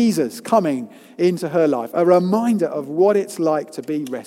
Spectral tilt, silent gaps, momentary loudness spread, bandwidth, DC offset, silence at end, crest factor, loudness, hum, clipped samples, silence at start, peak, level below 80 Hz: -6.5 dB/octave; none; 10 LU; 16.5 kHz; under 0.1%; 0.05 s; 16 dB; -19 LUFS; none; under 0.1%; 0 s; -2 dBFS; -72 dBFS